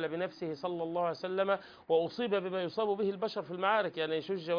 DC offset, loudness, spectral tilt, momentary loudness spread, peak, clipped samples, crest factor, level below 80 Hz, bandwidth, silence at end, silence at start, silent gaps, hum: under 0.1%; -34 LUFS; -3.5 dB/octave; 6 LU; -16 dBFS; under 0.1%; 16 dB; -78 dBFS; 5.2 kHz; 0 s; 0 s; none; none